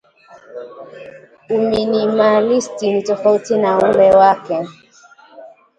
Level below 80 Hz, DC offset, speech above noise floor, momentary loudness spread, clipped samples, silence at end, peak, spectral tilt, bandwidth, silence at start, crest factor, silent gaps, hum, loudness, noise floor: -54 dBFS; under 0.1%; 31 dB; 23 LU; under 0.1%; 0.3 s; 0 dBFS; -5.5 dB/octave; 9.4 kHz; 0.5 s; 16 dB; none; none; -14 LUFS; -46 dBFS